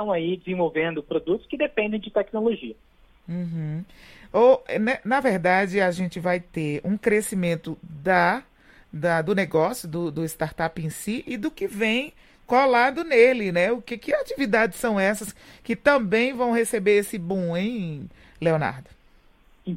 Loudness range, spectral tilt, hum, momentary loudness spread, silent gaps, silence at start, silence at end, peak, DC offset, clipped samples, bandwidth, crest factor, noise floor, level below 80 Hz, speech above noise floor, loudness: 5 LU; -5.5 dB/octave; none; 12 LU; none; 0 s; 0 s; -2 dBFS; under 0.1%; under 0.1%; 16.5 kHz; 20 dB; -56 dBFS; -54 dBFS; 32 dB; -23 LUFS